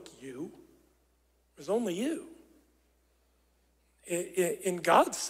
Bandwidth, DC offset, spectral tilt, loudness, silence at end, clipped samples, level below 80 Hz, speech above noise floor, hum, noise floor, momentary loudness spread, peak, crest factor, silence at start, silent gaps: 16 kHz; under 0.1%; -3.5 dB/octave; -31 LUFS; 0 s; under 0.1%; -72 dBFS; 41 dB; none; -70 dBFS; 21 LU; -10 dBFS; 24 dB; 0 s; none